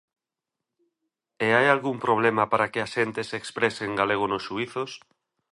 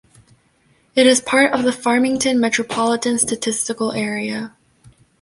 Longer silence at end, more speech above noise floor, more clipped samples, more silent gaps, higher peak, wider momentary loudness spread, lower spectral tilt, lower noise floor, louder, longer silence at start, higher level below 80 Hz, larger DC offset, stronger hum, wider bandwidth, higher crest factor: second, 0.55 s vs 0.75 s; first, 62 dB vs 41 dB; neither; neither; about the same, -4 dBFS vs -2 dBFS; about the same, 11 LU vs 9 LU; first, -5 dB/octave vs -2.5 dB/octave; first, -87 dBFS vs -58 dBFS; second, -25 LUFS vs -17 LUFS; first, 1.4 s vs 0.95 s; second, -66 dBFS vs -58 dBFS; neither; neither; about the same, 11.5 kHz vs 11.5 kHz; about the same, 22 dB vs 18 dB